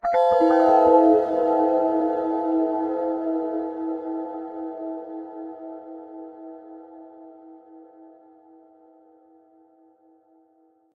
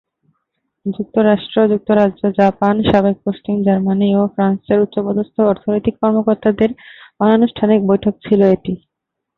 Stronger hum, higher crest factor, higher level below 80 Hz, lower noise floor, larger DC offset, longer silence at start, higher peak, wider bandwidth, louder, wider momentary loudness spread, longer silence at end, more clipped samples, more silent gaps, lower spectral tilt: neither; about the same, 20 dB vs 16 dB; second, -64 dBFS vs -46 dBFS; second, -61 dBFS vs -79 dBFS; neither; second, 0.05 s vs 0.85 s; second, -4 dBFS vs 0 dBFS; first, 6 kHz vs 4.4 kHz; second, -22 LUFS vs -15 LUFS; first, 24 LU vs 6 LU; first, 2.9 s vs 0.6 s; neither; neither; second, -7 dB/octave vs -9.5 dB/octave